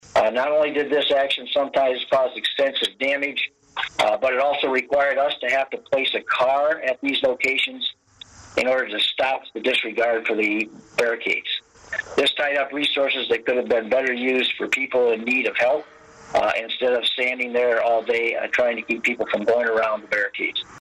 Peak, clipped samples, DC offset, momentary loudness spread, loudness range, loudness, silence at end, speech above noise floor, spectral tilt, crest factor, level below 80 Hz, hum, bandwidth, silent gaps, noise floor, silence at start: -10 dBFS; under 0.1%; under 0.1%; 5 LU; 1 LU; -21 LUFS; 0 s; 24 dB; -3 dB/octave; 12 dB; -62 dBFS; none; 13 kHz; none; -46 dBFS; 0.15 s